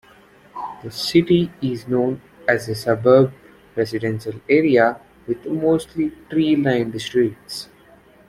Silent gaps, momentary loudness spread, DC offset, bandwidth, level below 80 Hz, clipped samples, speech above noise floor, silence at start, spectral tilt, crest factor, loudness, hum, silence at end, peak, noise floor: none; 16 LU; under 0.1%; 15 kHz; -54 dBFS; under 0.1%; 31 dB; 0.55 s; -6.5 dB/octave; 18 dB; -19 LUFS; none; 0.65 s; -2 dBFS; -50 dBFS